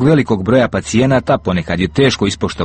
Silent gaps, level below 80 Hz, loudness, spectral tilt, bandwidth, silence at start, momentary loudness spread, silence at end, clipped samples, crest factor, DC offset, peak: none; -36 dBFS; -14 LUFS; -6 dB/octave; 8.8 kHz; 0 s; 4 LU; 0 s; under 0.1%; 12 dB; under 0.1%; 0 dBFS